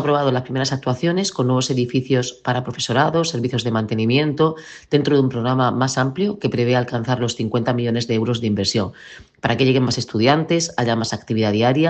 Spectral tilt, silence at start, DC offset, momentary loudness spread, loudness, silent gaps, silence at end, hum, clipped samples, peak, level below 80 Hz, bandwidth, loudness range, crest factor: -5.5 dB/octave; 0 s; under 0.1%; 5 LU; -19 LUFS; none; 0 s; none; under 0.1%; -2 dBFS; -56 dBFS; 8.6 kHz; 1 LU; 16 dB